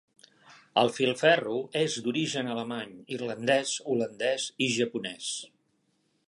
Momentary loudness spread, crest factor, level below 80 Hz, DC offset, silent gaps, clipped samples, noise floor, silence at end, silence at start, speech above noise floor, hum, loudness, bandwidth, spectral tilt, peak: 12 LU; 22 dB; -78 dBFS; under 0.1%; none; under 0.1%; -73 dBFS; 0.85 s; 0.5 s; 44 dB; none; -29 LUFS; 11.5 kHz; -3.5 dB/octave; -8 dBFS